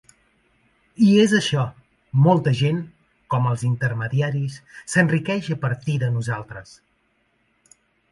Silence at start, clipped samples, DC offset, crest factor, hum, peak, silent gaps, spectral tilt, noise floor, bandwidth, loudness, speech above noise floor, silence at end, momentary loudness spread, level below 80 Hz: 1 s; under 0.1%; under 0.1%; 20 dB; none; -2 dBFS; none; -6.5 dB/octave; -66 dBFS; 11.5 kHz; -21 LUFS; 46 dB; 1.5 s; 13 LU; -58 dBFS